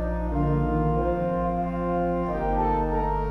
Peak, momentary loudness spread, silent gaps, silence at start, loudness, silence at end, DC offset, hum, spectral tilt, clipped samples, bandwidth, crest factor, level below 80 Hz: -12 dBFS; 3 LU; none; 0 s; -26 LUFS; 0 s; under 0.1%; none; -10.5 dB/octave; under 0.1%; 5.6 kHz; 12 dB; -32 dBFS